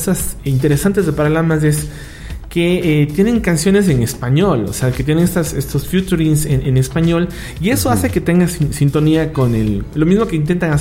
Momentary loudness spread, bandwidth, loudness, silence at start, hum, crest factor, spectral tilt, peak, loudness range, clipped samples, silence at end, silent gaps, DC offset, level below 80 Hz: 5 LU; 16.5 kHz; -15 LUFS; 0 s; none; 12 dB; -6 dB/octave; -2 dBFS; 1 LU; under 0.1%; 0 s; none; under 0.1%; -30 dBFS